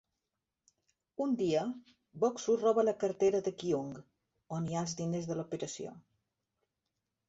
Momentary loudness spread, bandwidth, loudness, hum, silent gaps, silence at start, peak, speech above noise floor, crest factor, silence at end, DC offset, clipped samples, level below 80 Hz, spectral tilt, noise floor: 15 LU; 8 kHz; -34 LUFS; none; none; 1.2 s; -18 dBFS; 55 dB; 18 dB; 1.3 s; under 0.1%; under 0.1%; -74 dBFS; -6 dB/octave; -88 dBFS